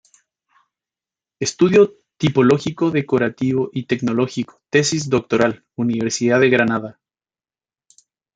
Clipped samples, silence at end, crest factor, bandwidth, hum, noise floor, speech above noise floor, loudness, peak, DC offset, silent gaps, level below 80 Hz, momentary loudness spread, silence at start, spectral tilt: under 0.1%; 1.45 s; 18 dB; 9.4 kHz; none; under -90 dBFS; over 73 dB; -18 LUFS; 0 dBFS; under 0.1%; none; -58 dBFS; 9 LU; 1.4 s; -5 dB/octave